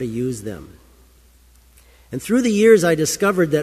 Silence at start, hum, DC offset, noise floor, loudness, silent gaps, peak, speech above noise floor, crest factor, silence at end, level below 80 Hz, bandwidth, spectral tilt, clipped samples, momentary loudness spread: 0 s; none; under 0.1%; -51 dBFS; -17 LUFS; none; -2 dBFS; 34 dB; 18 dB; 0 s; -50 dBFS; 15 kHz; -5 dB/octave; under 0.1%; 20 LU